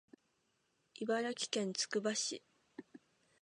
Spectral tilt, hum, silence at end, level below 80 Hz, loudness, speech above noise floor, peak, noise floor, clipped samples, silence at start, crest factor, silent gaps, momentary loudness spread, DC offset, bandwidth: -2.5 dB/octave; none; 0.45 s; under -90 dBFS; -38 LUFS; 42 dB; -20 dBFS; -80 dBFS; under 0.1%; 1 s; 22 dB; none; 21 LU; under 0.1%; 11 kHz